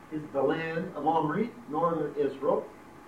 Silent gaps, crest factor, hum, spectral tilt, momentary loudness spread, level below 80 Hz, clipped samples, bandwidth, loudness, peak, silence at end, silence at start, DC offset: none; 16 dB; none; -8 dB/octave; 5 LU; -66 dBFS; under 0.1%; 14 kHz; -30 LUFS; -14 dBFS; 0 s; 0 s; under 0.1%